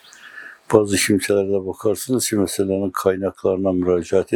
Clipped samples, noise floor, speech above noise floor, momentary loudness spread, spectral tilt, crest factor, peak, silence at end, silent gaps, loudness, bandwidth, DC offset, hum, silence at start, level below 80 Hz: under 0.1%; -40 dBFS; 21 dB; 7 LU; -4.5 dB/octave; 20 dB; 0 dBFS; 0 s; none; -19 LUFS; 19 kHz; under 0.1%; none; 0.25 s; -58 dBFS